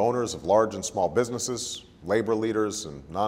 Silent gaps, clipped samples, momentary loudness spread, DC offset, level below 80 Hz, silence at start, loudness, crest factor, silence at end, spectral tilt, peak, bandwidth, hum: none; under 0.1%; 11 LU; under 0.1%; -56 dBFS; 0 s; -27 LUFS; 18 dB; 0 s; -4 dB/octave; -8 dBFS; 16 kHz; none